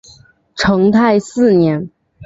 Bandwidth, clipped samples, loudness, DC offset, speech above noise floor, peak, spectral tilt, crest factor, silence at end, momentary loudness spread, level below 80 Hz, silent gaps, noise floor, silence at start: 8 kHz; under 0.1%; -13 LUFS; under 0.1%; 34 dB; -2 dBFS; -6.5 dB/octave; 12 dB; 0 s; 15 LU; -44 dBFS; none; -46 dBFS; 0.55 s